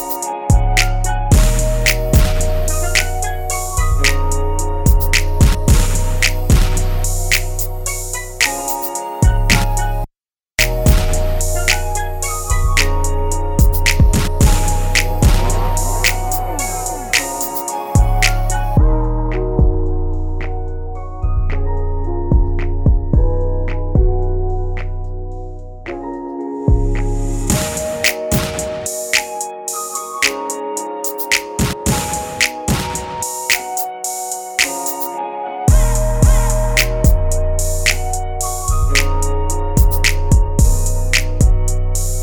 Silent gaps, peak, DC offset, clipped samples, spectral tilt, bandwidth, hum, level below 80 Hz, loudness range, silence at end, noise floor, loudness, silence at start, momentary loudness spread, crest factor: none; 0 dBFS; under 0.1%; under 0.1%; -4 dB/octave; over 20 kHz; none; -16 dBFS; 4 LU; 0 s; -70 dBFS; -17 LUFS; 0 s; 8 LU; 14 dB